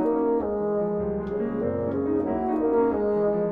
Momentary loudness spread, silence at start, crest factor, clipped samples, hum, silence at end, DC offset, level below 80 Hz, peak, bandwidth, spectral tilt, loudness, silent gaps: 5 LU; 0 s; 12 dB; under 0.1%; none; 0 s; under 0.1%; -48 dBFS; -12 dBFS; 3.7 kHz; -11 dB/octave; -25 LUFS; none